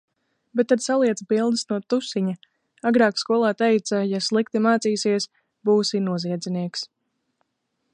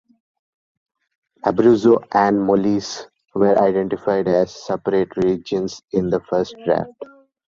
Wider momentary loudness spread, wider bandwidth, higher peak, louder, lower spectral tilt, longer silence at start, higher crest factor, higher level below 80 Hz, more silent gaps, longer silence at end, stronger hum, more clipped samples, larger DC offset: about the same, 9 LU vs 10 LU; first, 11 kHz vs 7.6 kHz; second, -6 dBFS vs -2 dBFS; second, -22 LUFS vs -19 LUFS; second, -5 dB/octave vs -6.5 dB/octave; second, 0.55 s vs 1.45 s; about the same, 18 dB vs 16 dB; second, -74 dBFS vs -54 dBFS; neither; first, 1.1 s vs 0.4 s; neither; neither; neither